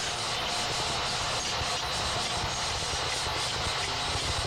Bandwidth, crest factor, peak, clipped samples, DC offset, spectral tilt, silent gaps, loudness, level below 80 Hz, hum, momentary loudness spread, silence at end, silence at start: 16 kHz; 12 dB; -18 dBFS; under 0.1%; under 0.1%; -2 dB/octave; none; -29 LUFS; -46 dBFS; none; 1 LU; 0 s; 0 s